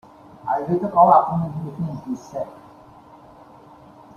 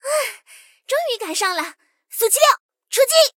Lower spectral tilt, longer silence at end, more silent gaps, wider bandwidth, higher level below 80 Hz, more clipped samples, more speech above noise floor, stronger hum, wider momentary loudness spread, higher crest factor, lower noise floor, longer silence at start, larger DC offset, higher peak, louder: first, -9 dB/octave vs 3 dB/octave; first, 1.6 s vs 0.1 s; second, none vs 2.60-2.69 s; second, 7.2 kHz vs 17 kHz; first, -58 dBFS vs -76 dBFS; neither; second, 26 dB vs 32 dB; neither; first, 18 LU vs 13 LU; about the same, 20 dB vs 18 dB; about the same, -46 dBFS vs -49 dBFS; first, 0.45 s vs 0.05 s; neither; about the same, -2 dBFS vs -2 dBFS; about the same, -20 LUFS vs -18 LUFS